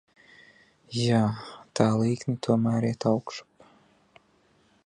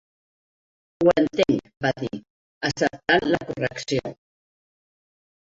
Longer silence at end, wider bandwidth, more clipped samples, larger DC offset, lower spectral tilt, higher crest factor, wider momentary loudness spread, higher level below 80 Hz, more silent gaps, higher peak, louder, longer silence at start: first, 1.45 s vs 1.3 s; first, 10.5 kHz vs 8 kHz; neither; neither; first, -6.5 dB/octave vs -5 dB/octave; about the same, 22 dB vs 22 dB; first, 14 LU vs 11 LU; second, -64 dBFS vs -56 dBFS; second, none vs 2.30-2.61 s; about the same, -6 dBFS vs -4 dBFS; second, -26 LUFS vs -23 LUFS; about the same, 0.9 s vs 1 s